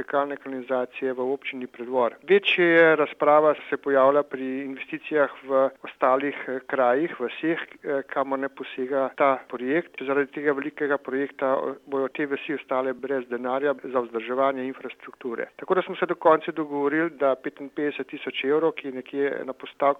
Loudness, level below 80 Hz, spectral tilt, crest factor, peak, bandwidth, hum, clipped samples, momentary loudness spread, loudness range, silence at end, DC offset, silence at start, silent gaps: -25 LUFS; -78 dBFS; -7 dB/octave; 20 dB; -4 dBFS; 5.8 kHz; none; under 0.1%; 13 LU; 6 LU; 0 s; under 0.1%; 0 s; none